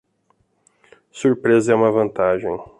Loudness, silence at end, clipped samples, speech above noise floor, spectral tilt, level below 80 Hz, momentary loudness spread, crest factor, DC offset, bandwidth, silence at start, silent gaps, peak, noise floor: -18 LUFS; 0.15 s; under 0.1%; 47 dB; -6.5 dB/octave; -56 dBFS; 6 LU; 16 dB; under 0.1%; 11 kHz; 1.15 s; none; -4 dBFS; -64 dBFS